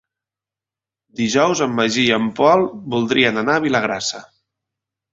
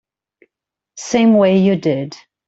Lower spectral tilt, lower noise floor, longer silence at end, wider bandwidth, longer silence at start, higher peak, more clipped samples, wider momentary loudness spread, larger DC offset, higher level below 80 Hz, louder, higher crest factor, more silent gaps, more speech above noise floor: second, -4 dB/octave vs -6.5 dB/octave; first, -89 dBFS vs -82 dBFS; first, 0.9 s vs 0.35 s; about the same, 8 kHz vs 8 kHz; first, 1.2 s vs 0.95 s; about the same, -2 dBFS vs -2 dBFS; neither; second, 9 LU vs 17 LU; neither; about the same, -58 dBFS vs -58 dBFS; second, -17 LUFS vs -14 LUFS; about the same, 18 dB vs 14 dB; neither; first, 72 dB vs 68 dB